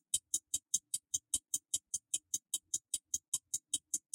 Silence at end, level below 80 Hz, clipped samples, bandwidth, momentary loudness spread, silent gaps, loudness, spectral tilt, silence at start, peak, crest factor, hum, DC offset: 0.15 s; -72 dBFS; under 0.1%; 16.5 kHz; 2 LU; 3.28-3.32 s; -37 LUFS; 2 dB/octave; 0.15 s; -16 dBFS; 24 dB; none; under 0.1%